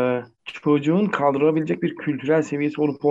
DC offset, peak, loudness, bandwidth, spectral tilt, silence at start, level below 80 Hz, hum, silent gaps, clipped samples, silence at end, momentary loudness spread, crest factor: under 0.1%; -6 dBFS; -22 LUFS; 7.8 kHz; -7.5 dB/octave; 0 s; -68 dBFS; none; none; under 0.1%; 0 s; 8 LU; 16 dB